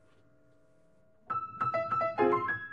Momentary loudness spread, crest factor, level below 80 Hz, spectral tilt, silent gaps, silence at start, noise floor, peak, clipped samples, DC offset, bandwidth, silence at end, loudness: 9 LU; 20 dB; -72 dBFS; -8 dB/octave; none; 1.3 s; -67 dBFS; -14 dBFS; under 0.1%; under 0.1%; 7.2 kHz; 0 s; -31 LUFS